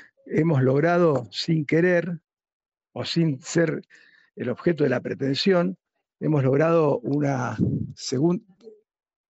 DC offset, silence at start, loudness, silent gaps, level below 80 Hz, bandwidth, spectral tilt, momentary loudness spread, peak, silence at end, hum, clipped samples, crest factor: under 0.1%; 0.25 s; -23 LUFS; 2.53-2.60 s, 2.68-2.72 s; -62 dBFS; 8.2 kHz; -6.5 dB/octave; 11 LU; -10 dBFS; 0.6 s; none; under 0.1%; 14 dB